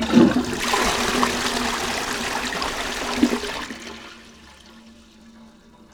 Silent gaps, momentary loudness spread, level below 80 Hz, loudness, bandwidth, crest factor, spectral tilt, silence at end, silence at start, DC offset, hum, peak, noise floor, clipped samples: none; 16 LU; -44 dBFS; -22 LUFS; over 20 kHz; 22 dB; -3.5 dB/octave; 0.45 s; 0 s; under 0.1%; none; -2 dBFS; -48 dBFS; under 0.1%